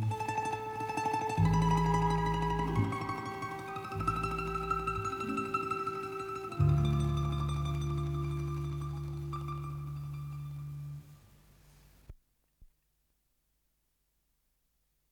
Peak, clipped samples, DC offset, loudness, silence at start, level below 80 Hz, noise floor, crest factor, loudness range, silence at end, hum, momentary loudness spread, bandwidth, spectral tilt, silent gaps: -18 dBFS; under 0.1%; under 0.1%; -34 LUFS; 0 s; -46 dBFS; -77 dBFS; 18 dB; 14 LU; 2.45 s; none; 12 LU; 17 kHz; -7 dB/octave; none